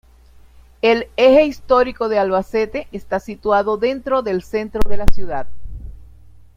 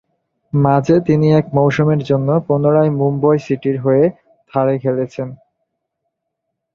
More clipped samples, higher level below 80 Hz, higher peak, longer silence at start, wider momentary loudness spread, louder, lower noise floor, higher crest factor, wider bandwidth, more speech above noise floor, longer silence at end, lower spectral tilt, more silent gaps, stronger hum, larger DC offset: first, 0.3% vs under 0.1%; first, -30 dBFS vs -52 dBFS; about the same, 0 dBFS vs -2 dBFS; first, 0.85 s vs 0.55 s; first, 14 LU vs 8 LU; second, -18 LUFS vs -15 LUFS; second, -46 dBFS vs -76 dBFS; about the same, 16 dB vs 14 dB; first, 13.5 kHz vs 7 kHz; second, 31 dB vs 62 dB; second, 0.65 s vs 1.4 s; second, -6 dB/octave vs -9 dB/octave; neither; neither; neither